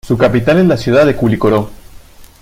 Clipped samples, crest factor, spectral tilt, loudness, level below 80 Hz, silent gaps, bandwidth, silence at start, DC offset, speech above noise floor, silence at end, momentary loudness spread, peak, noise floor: under 0.1%; 12 dB; -7.5 dB/octave; -11 LUFS; -36 dBFS; none; 16 kHz; 0.05 s; under 0.1%; 26 dB; 0.15 s; 5 LU; 0 dBFS; -36 dBFS